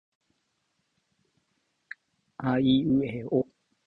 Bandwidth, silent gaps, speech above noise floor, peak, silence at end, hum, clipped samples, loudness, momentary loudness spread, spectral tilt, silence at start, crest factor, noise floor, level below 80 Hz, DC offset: 4.5 kHz; none; 51 dB; -12 dBFS; 0.45 s; none; under 0.1%; -26 LUFS; 23 LU; -9 dB/octave; 2.4 s; 18 dB; -76 dBFS; -60 dBFS; under 0.1%